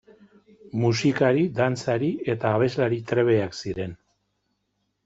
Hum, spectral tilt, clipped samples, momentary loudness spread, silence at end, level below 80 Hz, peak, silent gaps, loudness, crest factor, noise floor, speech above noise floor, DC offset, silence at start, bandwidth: none; -6.5 dB/octave; under 0.1%; 10 LU; 1.1 s; -60 dBFS; -8 dBFS; none; -24 LUFS; 18 dB; -75 dBFS; 52 dB; under 0.1%; 0.65 s; 8 kHz